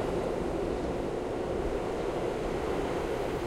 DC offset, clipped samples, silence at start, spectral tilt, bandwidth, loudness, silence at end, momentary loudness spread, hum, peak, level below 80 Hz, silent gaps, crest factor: under 0.1%; under 0.1%; 0 s; -6.5 dB/octave; 16 kHz; -33 LUFS; 0 s; 1 LU; none; -20 dBFS; -42 dBFS; none; 12 dB